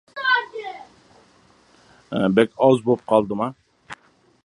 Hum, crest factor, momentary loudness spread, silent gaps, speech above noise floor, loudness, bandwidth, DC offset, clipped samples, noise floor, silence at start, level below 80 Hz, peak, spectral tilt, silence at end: none; 22 dB; 24 LU; none; 37 dB; -20 LUFS; 11 kHz; under 0.1%; under 0.1%; -56 dBFS; 0.15 s; -62 dBFS; -2 dBFS; -6.5 dB/octave; 0.5 s